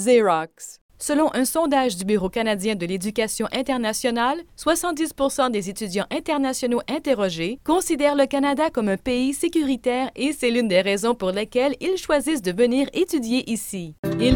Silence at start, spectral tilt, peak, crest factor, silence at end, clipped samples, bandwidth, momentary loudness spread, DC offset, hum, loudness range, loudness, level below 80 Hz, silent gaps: 0 s; -4 dB/octave; -4 dBFS; 18 dB; 0 s; under 0.1%; 18 kHz; 6 LU; under 0.1%; none; 2 LU; -22 LUFS; -46 dBFS; 0.81-0.89 s, 13.99-14.03 s